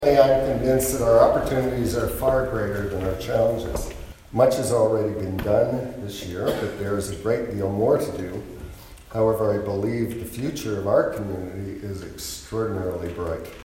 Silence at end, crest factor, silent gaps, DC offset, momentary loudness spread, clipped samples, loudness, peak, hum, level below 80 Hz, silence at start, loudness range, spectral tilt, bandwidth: 0 s; 20 dB; none; under 0.1%; 14 LU; under 0.1%; -23 LUFS; -2 dBFS; none; -40 dBFS; 0 s; 5 LU; -6 dB/octave; 16.5 kHz